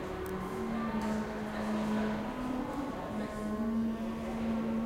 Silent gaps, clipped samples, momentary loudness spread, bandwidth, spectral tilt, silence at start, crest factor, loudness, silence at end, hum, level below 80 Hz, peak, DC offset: none; under 0.1%; 5 LU; 16 kHz; -6.5 dB/octave; 0 s; 12 dB; -35 LUFS; 0 s; none; -50 dBFS; -22 dBFS; under 0.1%